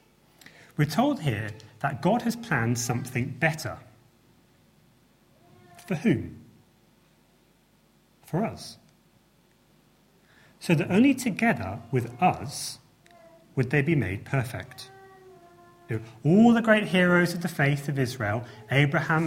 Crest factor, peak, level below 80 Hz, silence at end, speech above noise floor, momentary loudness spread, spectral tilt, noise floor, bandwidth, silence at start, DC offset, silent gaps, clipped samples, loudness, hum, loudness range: 20 dB; -6 dBFS; -62 dBFS; 0 s; 38 dB; 16 LU; -6 dB/octave; -62 dBFS; 16.5 kHz; 0.8 s; under 0.1%; none; under 0.1%; -26 LUFS; none; 12 LU